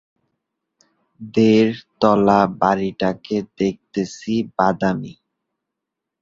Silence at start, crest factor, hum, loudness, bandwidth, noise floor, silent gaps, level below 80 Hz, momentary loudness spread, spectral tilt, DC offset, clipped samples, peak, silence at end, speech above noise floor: 1.2 s; 18 dB; none; -19 LUFS; 7.6 kHz; -82 dBFS; none; -54 dBFS; 11 LU; -7 dB/octave; under 0.1%; under 0.1%; -2 dBFS; 1.1 s; 64 dB